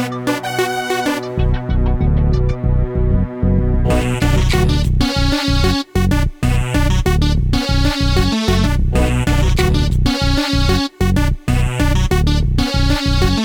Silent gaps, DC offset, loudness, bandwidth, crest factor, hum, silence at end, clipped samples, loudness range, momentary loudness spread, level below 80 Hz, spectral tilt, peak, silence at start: none; under 0.1%; -16 LUFS; over 20 kHz; 14 dB; none; 0 s; under 0.1%; 2 LU; 3 LU; -18 dBFS; -6 dB/octave; -2 dBFS; 0 s